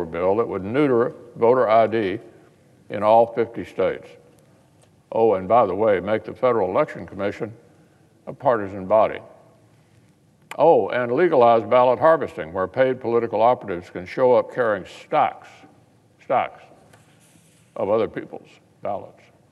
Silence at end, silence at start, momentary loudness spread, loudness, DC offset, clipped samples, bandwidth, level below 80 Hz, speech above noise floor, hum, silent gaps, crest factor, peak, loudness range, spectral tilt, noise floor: 0.45 s; 0 s; 16 LU; -20 LUFS; under 0.1%; under 0.1%; 10.5 kHz; -68 dBFS; 36 dB; none; none; 18 dB; -2 dBFS; 8 LU; -7.5 dB/octave; -56 dBFS